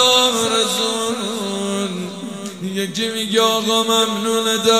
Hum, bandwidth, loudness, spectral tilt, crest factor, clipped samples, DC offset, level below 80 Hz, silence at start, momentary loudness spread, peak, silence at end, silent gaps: none; 16 kHz; -18 LUFS; -2.5 dB/octave; 18 dB; under 0.1%; 0.2%; -66 dBFS; 0 s; 11 LU; 0 dBFS; 0 s; none